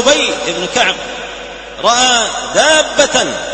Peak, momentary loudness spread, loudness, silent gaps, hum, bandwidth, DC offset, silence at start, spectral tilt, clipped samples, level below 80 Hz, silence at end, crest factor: 0 dBFS; 15 LU; -12 LUFS; none; none; 11 kHz; under 0.1%; 0 s; -1 dB/octave; 0.1%; -42 dBFS; 0 s; 14 dB